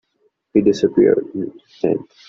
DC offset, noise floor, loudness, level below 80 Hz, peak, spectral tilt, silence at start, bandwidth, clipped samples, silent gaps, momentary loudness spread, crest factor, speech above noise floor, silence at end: under 0.1%; -65 dBFS; -18 LUFS; -56 dBFS; -2 dBFS; -7 dB/octave; 0.55 s; 7.4 kHz; under 0.1%; none; 13 LU; 16 dB; 48 dB; 0.25 s